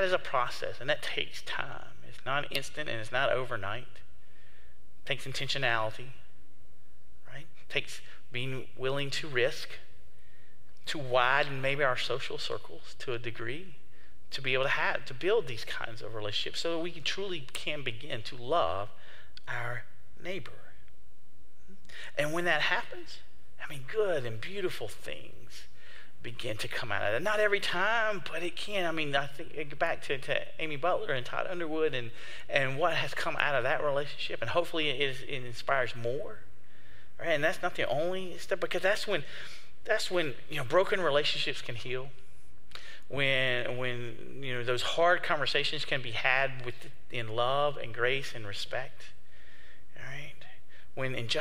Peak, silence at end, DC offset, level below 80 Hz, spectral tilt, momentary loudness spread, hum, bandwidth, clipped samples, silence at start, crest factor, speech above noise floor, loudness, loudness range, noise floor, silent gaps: -8 dBFS; 0 s; 3%; -64 dBFS; -4 dB/octave; 18 LU; none; 16 kHz; under 0.1%; 0 s; 26 dB; 32 dB; -32 LUFS; 6 LU; -64 dBFS; none